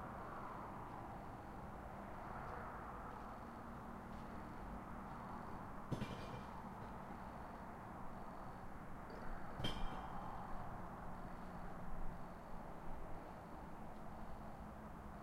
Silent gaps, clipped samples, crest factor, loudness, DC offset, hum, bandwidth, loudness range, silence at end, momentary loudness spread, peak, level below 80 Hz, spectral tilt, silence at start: none; under 0.1%; 20 dB; -52 LUFS; under 0.1%; none; 16 kHz; 3 LU; 0 s; 5 LU; -28 dBFS; -54 dBFS; -6.5 dB/octave; 0 s